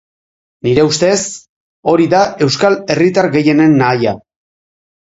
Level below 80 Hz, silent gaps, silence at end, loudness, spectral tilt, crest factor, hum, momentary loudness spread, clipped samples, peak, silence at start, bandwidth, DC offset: -48 dBFS; 1.49-1.83 s; 0.9 s; -12 LUFS; -5 dB/octave; 14 dB; none; 11 LU; under 0.1%; 0 dBFS; 0.65 s; 8 kHz; under 0.1%